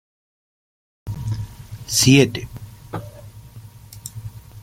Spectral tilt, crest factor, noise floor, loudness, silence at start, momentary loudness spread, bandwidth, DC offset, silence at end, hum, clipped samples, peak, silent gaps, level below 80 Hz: -4 dB/octave; 22 dB; -41 dBFS; -18 LUFS; 1.05 s; 27 LU; 16.5 kHz; under 0.1%; 0 s; none; under 0.1%; -2 dBFS; none; -46 dBFS